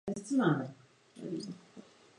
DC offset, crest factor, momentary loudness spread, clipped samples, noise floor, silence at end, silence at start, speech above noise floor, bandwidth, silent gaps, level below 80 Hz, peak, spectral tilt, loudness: under 0.1%; 20 dB; 23 LU; under 0.1%; -56 dBFS; 0.4 s; 0.05 s; 23 dB; 11 kHz; none; -74 dBFS; -16 dBFS; -6.5 dB/octave; -34 LUFS